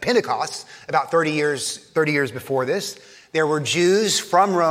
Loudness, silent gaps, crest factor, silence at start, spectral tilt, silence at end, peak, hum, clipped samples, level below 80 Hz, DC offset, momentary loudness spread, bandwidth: -21 LUFS; none; 18 dB; 0 s; -3.5 dB/octave; 0 s; -4 dBFS; none; under 0.1%; -66 dBFS; under 0.1%; 9 LU; 16 kHz